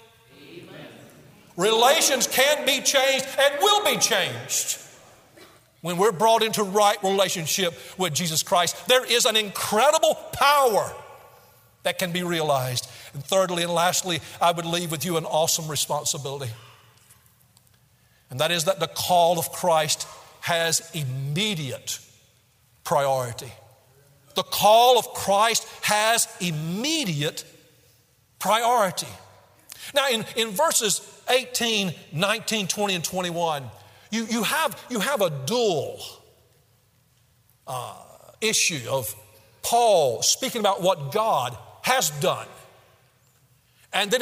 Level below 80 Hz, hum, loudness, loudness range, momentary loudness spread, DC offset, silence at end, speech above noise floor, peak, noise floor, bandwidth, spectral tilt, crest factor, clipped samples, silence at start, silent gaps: -66 dBFS; none; -22 LUFS; 7 LU; 14 LU; under 0.1%; 0 s; 39 dB; -2 dBFS; -62 dBFS; 16 kHz; -2.5 dB/octave; 22 dB; under 0.1%; 0.4 s; none